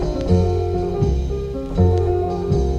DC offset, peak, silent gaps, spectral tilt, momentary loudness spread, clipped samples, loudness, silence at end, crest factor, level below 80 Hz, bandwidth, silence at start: under 0.1%; -4 dBFS; none; -9 dB/octave; 7 LU; under 0.1%; -20 LUFS; 0 s; 14 dB; -26 dBFS; 7.4 kHz; 0 s